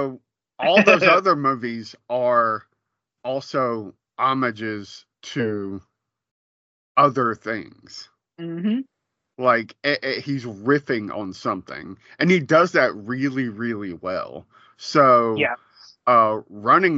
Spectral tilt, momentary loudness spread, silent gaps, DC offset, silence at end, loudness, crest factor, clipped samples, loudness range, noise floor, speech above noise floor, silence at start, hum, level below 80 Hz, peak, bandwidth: -3.5 dB/octave; 19 LU; 6.31-6.95 s; under 0.1%; 0 s; -21 LUFS; 22 dB; under 0.1%; 7 LU; -80 dBFS; 59 dB; 0 s; none; -70 dBFS; 0 dBFS; 7.8 kHz